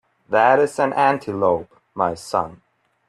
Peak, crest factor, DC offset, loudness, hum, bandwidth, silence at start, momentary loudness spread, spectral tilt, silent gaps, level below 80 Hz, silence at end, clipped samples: -2 dBFS; 18 dB; under 0.1%; -19 LUFS; none; 13 kHz; 0.3 s; 9 LU; -5.5 dB/octave; none; -60 dBFS; 0.55 s; under 0.1%